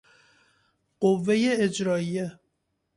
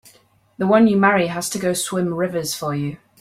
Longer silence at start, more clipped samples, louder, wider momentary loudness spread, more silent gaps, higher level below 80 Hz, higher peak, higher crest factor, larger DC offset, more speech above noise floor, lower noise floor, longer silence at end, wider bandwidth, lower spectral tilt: first, 1 s vs 0.6 s; neither; second, -25 LUFS vs -19 LUFS; about the same, 9 LU vs 10 LU; neither; second, -68 dBFS vs -58 dBFS; second, -10 dBFS vs -2 dBFS; about the same, 18 dB vs 18 dB; neither; first, 52 dB vs 35 dB; first, -76 dBFS vs -54 dBFS; first, 0.65 s vs 0.25 s; second, 11.5 kHz vs 16 kHz; about the same, -5.5 dB/octave vs -5 dB/octave